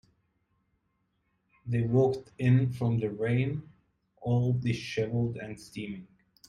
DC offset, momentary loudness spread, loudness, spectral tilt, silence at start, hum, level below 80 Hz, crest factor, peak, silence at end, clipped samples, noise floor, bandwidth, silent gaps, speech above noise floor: under 0.1%; 15 LU; -29 LUFS; -8 dB/octave; 1.65 s; none; -60 dBFS; 16 dB; -14 dBFS; 0.45 s; under 0.1%; -76 dBFS; 10 kHz; none; 48 dB